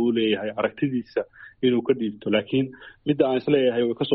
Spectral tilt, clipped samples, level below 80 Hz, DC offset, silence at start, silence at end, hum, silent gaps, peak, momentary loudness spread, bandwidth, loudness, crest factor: -5 dB/octave; under 0.1%; -62 dBFS; under 0.1%; 0 s; 0 s; none; none; -6 dBFS; 10 LU; 5.6 kHz; -24 LUFS; 18 dB